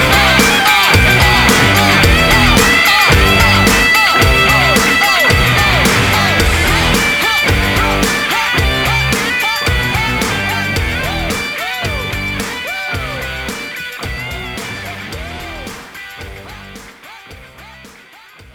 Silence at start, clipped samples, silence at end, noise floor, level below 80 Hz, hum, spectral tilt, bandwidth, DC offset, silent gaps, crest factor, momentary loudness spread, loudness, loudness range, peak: 0 s; under 0.1%; 0.65 s; -40 dBFS; -24 dBFS; none; -3.5 dB/octave; over 20 kHz; under 0.1%; none; 12 dB; 17 LU; -10 LUFS; 17 LU; 0 dBFS